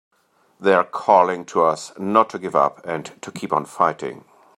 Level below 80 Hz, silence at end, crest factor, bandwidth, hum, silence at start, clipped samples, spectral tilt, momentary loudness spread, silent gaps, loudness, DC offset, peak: -70 dBFS; 0.4 s; 20 dB; 13.5 kHz; none; 0.6 s; under 0.1%; -5 dB/octave; 14 LU; none; -20 LUFS; under 0.1%; -2 dBFS